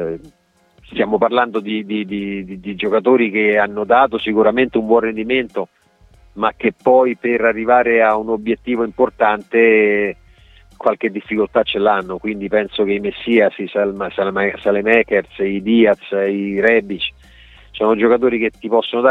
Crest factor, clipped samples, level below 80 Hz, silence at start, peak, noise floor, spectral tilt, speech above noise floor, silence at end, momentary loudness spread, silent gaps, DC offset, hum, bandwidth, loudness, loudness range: 16 dB; under 0.1%; -50 dBFS; 0 s; 0 dBFS; -50 dBFS; -7.5 dB/octave; 34 dB; 0 s; 10 LU; none; under 0.1%; none; 4.4 kHz; -16 LUFS; 2 LU